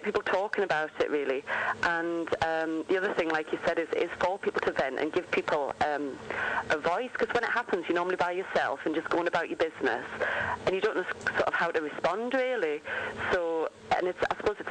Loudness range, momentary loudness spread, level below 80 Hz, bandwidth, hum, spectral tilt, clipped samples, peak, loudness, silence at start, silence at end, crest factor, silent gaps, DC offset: 1 LU; 3 LU; -62 dBFS; 9.8 kHz; none; -4.5 dB/octave; under 0.1%; -16 dBFS; -30 LUFS; 0 s; 0 s; 14 dB; none; under 0.1%